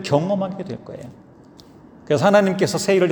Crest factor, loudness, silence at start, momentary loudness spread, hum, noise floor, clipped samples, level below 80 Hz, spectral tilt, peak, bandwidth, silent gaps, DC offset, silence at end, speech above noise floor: 18 dB; -19 LUFS; 0 s; 21 LU; none; -46 dBFS; under 0.1%; -60 dBFS; -5.5 dB/octave; -2 dBFS; over 20 kHz; none; under 0.1%; 0 s; 27 dB